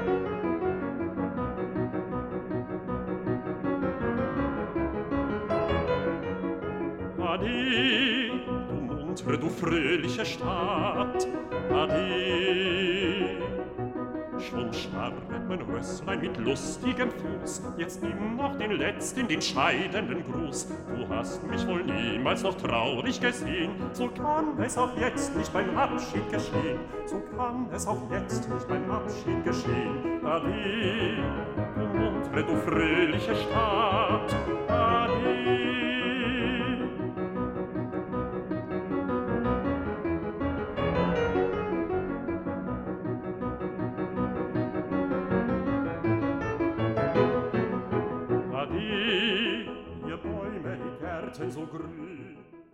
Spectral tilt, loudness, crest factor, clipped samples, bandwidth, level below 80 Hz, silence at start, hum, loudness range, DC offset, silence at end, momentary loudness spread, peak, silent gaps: -5.5 dB/octave; -29 LUFS; 20 dB; under 0.1%; 15.5 kHz; -48 dBFS; 0 s; none; 5 LU; under 0.1%; 0.1 s; 9 LU; -10 dBFS; none